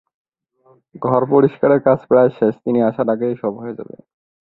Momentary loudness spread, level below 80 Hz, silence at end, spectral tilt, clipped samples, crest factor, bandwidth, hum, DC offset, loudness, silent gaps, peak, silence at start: 15 LU; -60 dBFS; 0.7 s; -11.5 dB/octave; under 0.1%; 18 dB; 4.2 kHz; none; under 0.1%; -16 LUFS; none; 0 dBFS; 0.95 s